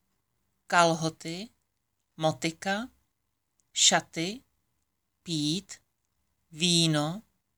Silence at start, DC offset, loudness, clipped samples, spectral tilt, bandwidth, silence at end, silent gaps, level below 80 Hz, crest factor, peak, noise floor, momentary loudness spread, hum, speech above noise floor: 0.7 s; under 0.1%; -27 LUFS; under 0.1%; -3 dB/octave; over 20 kHz; 0.35 s; none; -72 dBFS; 24 dB; -8 dBFS; -81 dBFS; 21 LU; none; 53 dB